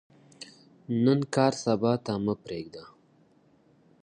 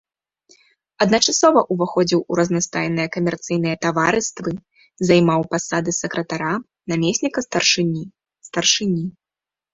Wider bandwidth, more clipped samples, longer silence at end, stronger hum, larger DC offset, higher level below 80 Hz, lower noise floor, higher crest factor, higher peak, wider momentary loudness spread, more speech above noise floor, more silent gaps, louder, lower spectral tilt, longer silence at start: first, 10.5 kHz vs 8 kHz; neither; first, 1.15 s vs 0.65 s; neither; neither; second, -66 dBFS vs -56 dBFS; second, -62 dBFS vs -89 dBFS; about the same, 22 dB vs 20 dB; second, -8 dBFS vs 0 dBFS; first, 22 LU vs 11 LU; second, 36 dB vs 70 dB; neither; second, -27 LUFS vs -19 LUFS; first, -6.5 dB/octave vs -4 dB/octave; second, 0.4 s vs 1 s